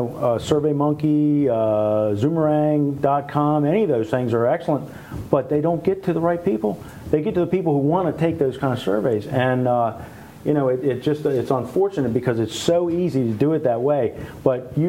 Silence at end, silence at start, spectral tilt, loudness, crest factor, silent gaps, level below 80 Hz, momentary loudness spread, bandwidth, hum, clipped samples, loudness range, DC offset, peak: 0 s; 0 s; -7.5 dB/octave; -21 LUFS; 18 dB; none; -50 dBFS; 5 LU; 16 kHz; none; under 0.1%; 2 LU; under 0.1%; -2 dBFS